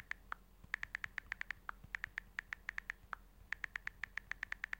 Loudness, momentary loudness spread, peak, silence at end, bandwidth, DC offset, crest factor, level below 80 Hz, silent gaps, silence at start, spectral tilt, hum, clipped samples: -46 LUFS; 6 LU; -20 dBFS; 0 s; 17 kHz; under 0.1%; 28 dB; -64 dBFS; none; 0 s; -2 dB/octave; none; under 0.1%